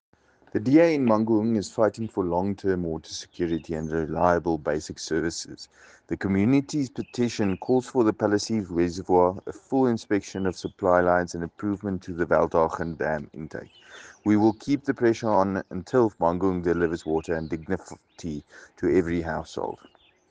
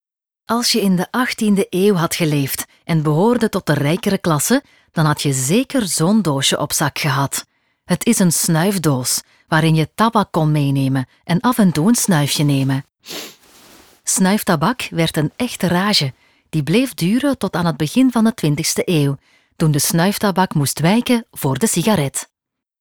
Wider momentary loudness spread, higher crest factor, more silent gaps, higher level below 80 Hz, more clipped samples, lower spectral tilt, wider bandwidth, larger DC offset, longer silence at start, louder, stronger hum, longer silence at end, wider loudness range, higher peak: first, 13 LU vs 7 LU; about the same, 20 dB vs 16 dB; neither; about the same, -52 dBFS vs -54 dBFS; neither; first, -6.5 dB/octave vs -4.5 dB/octave; second, 9.6 kHz vs over 20 kHz; neither; about the same, 0.55 s vs 0.5 s; second, -25 LUFS vs -17 LUFS; neither; about the same, 0.55 s vs 0.55 s; about the same, 3 LU vs 2 LU; second, -6 dBFS vs -2 dBFS